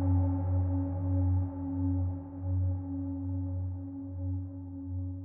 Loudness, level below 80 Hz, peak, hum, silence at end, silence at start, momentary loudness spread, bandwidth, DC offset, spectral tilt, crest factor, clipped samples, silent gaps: -33 LUFS; -48 dBFS; -18 dBFS; none; 0 s; 0 s; 9 LU; 1.8 kHz; under 0.1%; -12.5 dB/octave; 12 dB; under 0.1%; none